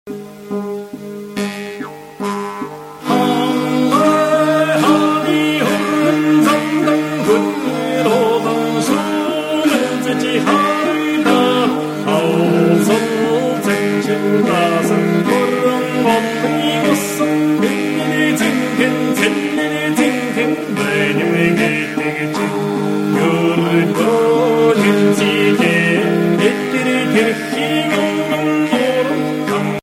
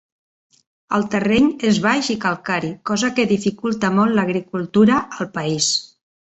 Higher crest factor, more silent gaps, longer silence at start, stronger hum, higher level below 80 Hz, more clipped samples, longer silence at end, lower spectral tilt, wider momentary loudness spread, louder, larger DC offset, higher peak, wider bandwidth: about the same, 14 dB vs 16 dB; neither; second, 0.05 s vs 0.9 s; neither; about the same, -58 dBFS vs -54 dBFS; neither; second, 0.05 s vs 0.45 s; about the same, -5 dB/octave vs -4.5 dB/octave; about the same, 6 LU vs 7 LU; first, -15 LUFS vs -19 LUFS; neither; about the same, 0 dBFS vs -2 dBFS; first, 16.5 kHz vs 8.4 kHz